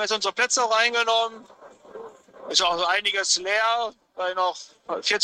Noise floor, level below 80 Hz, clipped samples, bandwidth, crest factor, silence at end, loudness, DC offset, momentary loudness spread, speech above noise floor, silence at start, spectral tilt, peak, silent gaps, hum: -43 dBFS; -66 dBFS; under 0.1%; 13 kHz; 22 dB; 0 s; -22 LUFS; under 0.1%; 17 LU; 19 dB; 0 s; 1 dB/octave; -4 dBFS; none; none